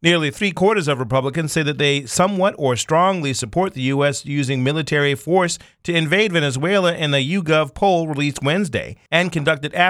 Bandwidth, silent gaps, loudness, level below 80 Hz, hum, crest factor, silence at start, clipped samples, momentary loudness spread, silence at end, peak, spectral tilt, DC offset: 14.5 kHz; none; -19 LUFS; -50 dBFS; none; 18 dB; 0 s; under 0.1%; 5 LU; 0 s; -2 dBFS; -4.5 dB/octave; under 0.1%